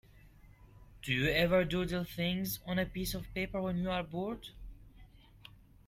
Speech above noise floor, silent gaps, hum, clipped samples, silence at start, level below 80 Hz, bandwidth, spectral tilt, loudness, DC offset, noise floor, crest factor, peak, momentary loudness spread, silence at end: 24 dB; none; none; under 0.1%; 0.15 s; -52 dBFS; 16 kHz; -5.5 dB/octave; -34 LUFS; under 0.1%; -58 dBFS; 20 dB; -16 dBFS; 17 LU; 0.5 s